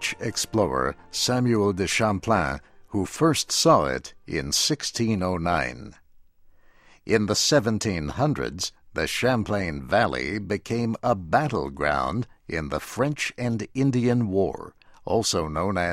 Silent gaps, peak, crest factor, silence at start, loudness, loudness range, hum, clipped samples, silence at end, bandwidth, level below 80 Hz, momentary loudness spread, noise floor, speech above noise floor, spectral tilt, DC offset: none; -6 dBFS; 20 dB; 0 s; -24 LUFS; 3 LU; none; under 0.1%; 0 s; 16 kHz; -46 dBFS; 10 LU; -54 dBFS; 29 dB; -4.5 dB/octave; under 0.1%